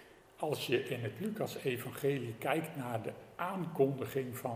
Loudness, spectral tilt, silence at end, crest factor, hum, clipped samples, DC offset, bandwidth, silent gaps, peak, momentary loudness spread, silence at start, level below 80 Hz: -37 LUFS; -6 dB/octave; 0 s; 20 dB; none; under 0.1%; under 0.1%; 16.5 kHz; none; -18 dBFS; 7 LU; 0 s; -74 dBFS